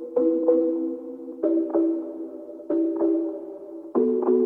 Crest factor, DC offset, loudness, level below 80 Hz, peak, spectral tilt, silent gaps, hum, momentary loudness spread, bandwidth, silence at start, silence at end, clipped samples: 16 dB; under 0.1%; -24 LUFS; -74 dBFS; -8 dBFS; -10 dB/octave; none; none; 16 LU; 2 kHz; 0 s; 0 s; under 0.1%